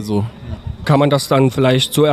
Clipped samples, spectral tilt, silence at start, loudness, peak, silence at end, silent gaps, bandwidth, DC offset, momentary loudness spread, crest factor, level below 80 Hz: under 0.1%; -6 dB/octave; 0 s; -15 LUFS; -2 dBFS; 0 s; none; 15 kHz; under 0.1%; 14 LU; 14 dB; -38 dBFS